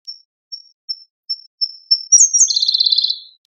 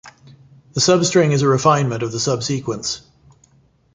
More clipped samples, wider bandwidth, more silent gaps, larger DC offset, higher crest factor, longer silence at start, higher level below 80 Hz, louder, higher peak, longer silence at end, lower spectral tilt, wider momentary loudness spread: neither; about the same, 9.8 kHz vs 9.6 kHz; first, 0.25-0.51 s, 0.74-0.88 s, 1.10-1.23 s, 1.47-1.58 s vs none; neither; about the same, 16 dB vs 18 dB; about the same, 0.1 s vs 0.05 s; second, under -90 dBFS vs -54 dBFS; first, -12 LUFS vs -17 LUFS; about the same, 0 dBFS vs -2 dBFS; second, 0.25 s vs 0.95 s; second, 15 dB/octave vs -4.5 dB/octave; first, 24 LU vs 11 LU